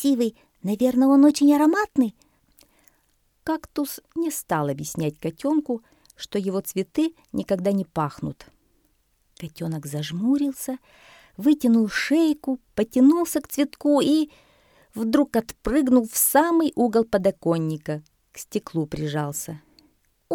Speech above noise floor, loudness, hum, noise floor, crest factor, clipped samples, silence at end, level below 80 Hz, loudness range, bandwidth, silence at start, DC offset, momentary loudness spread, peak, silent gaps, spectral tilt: 44 dB; -23 LUFS; none; -66 dBFS; 18 dB; under 0.1%; 0 s; -54 dBFS; 7 LU; 18.5 kHz; 0 s; under 0.1%; 14 LU; -4 dBFS; none; -5 dB/octave